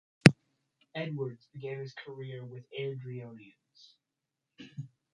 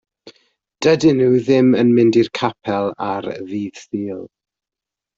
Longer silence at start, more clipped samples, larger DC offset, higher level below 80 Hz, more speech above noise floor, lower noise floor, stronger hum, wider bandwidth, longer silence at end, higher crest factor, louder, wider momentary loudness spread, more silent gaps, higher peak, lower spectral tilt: about the same, 0.25 s vs 0.25 s; neither; neither; second, -70 dBFS vs -58 dBFS; second, 47 dB vs 71 dB; about the same, -87 dBFS vs -87 dBFS; neither; first, 11 kHz vs 7.8 kHz; second, 0.3 s vs 0.9 s; first, 32 dB vs 16 dB; second, -32 LUFS vs -17 LUFS; first, 26 LU vs 13 LU; neither; about the same, -2 dBFS vs -2 dBFS; about the same, -6 dB/octave vs -6.5 dB/octave